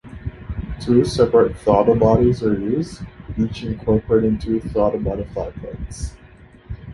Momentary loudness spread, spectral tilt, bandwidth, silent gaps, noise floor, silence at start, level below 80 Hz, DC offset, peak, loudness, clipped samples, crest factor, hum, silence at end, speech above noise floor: 17 LU; -7.5 dB/octave; 11.5 kHz; none; -45 dBFS; 0.05 s; -34 dBFS; under 0.1%; -2 dBFS; -18 LUFS; under 0.1%; 18 dB; none; 0 s; 27 dB